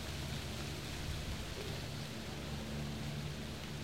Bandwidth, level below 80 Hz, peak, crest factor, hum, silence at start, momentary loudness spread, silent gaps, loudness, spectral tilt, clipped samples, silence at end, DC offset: 16 kHz; -50 dBFS; -30 dBFS; 14 dB; none; 0 s; 2 LU; none; -43 LUFS; -4.5 dB/octave; under 0.1%; 0 s; 0.2%